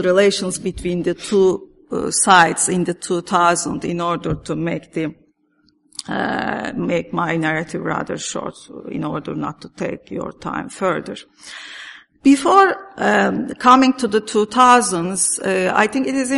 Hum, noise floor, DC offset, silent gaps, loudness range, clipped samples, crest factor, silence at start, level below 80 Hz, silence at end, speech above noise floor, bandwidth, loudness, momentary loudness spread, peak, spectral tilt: none; -61 dBFS; under 0.1%; none; 11 LU; under 0.1%; 18 dB; 0 s; -50 dBFS; 0 s; 43 dB; 11.5 kHz; -18 LUFS; 17 LU; 0 dBFS; -4 dB/octave